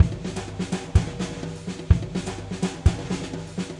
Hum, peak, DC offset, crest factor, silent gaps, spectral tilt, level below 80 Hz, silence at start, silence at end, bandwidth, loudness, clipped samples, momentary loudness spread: none; -2 dBFS; under 0.1%; 22 dB; none; -6 dB/octave; -32 dBFS; 0 s; 0 s; 11.5 kHz; -27 LUFS; under 0.1%; 10 LU